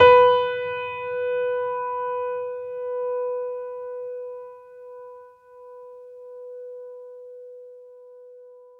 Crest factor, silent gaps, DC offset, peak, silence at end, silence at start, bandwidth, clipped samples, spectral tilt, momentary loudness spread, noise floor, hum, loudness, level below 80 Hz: 22 dB; none; under 0.1%; -2 dBFS; 0.2 s; 0 s; 4.9 kHz; under 0.1%; -5 dB/octave; 21 LU; -47 dBFS; none; -24 LUFS; -64 dBFS